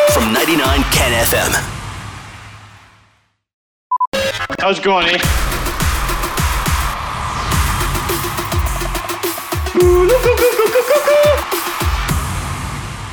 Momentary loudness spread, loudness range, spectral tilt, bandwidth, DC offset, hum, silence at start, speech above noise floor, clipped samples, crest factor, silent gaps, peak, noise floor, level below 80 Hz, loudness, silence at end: 11 LU; 6 LU; -4 dB/octave; over 20 kHz; under 0.1%; none; 0 s; 44 dB; under 0.1%; 14 dB; 3.53-3.90 s, 4.07-4.12 s; -2 dBFS; -57 dBFS; -24 dBFS; -15 LUFS; 0 s